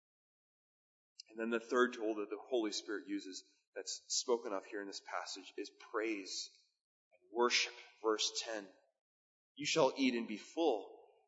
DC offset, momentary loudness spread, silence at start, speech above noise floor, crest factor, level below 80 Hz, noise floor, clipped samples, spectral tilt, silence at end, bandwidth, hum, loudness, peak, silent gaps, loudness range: under 0.1%; 15 LU; 1.3 s; over 51 dB; 24 dB; under -90 dBFS; under -90 dBFS; under 0.1%; -1 dB/octave; 0.25 s; 7.6 kHz; none; -38 LUFS; -16 dBFS; 3.67-3.73 s, 6.84-7.11 s, 9.01-9.55 s; 4 LU